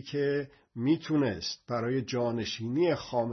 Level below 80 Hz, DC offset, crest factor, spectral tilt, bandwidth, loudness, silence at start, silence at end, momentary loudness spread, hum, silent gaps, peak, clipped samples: -66 dBFS; under 0.1%; 16 dB; -6 dB/octave; 6.4 kHz; -30 LUFS; 0 s; 0 s; 6 LU; none; none; -14 dBFS; under 0.1%